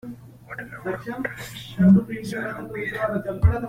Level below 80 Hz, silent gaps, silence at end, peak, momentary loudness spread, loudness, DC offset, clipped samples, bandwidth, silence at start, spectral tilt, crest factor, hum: -36 dBFS; none; 0 s; -6 dBFS; 20 LU; -24 LUFS; under 0.1%; under 0.1%; 15 kHz; 0.05 s; -8 dB/octave; 18 dB; none